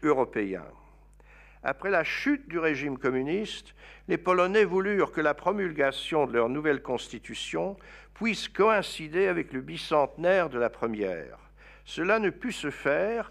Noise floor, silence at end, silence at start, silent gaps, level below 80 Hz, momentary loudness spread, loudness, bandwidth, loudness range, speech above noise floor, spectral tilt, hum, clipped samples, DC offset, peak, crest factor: -55 dBFS; 0 s; 0 s; none; -56 dBFS; 11 LU; -28 LUFS; 13.5 kHz; 3 LU; 27 dB; -5 dB/octave; 50 Hz at -55 dBFS; under 0.1%; under 0.1%; -10 dBFS; 18 dB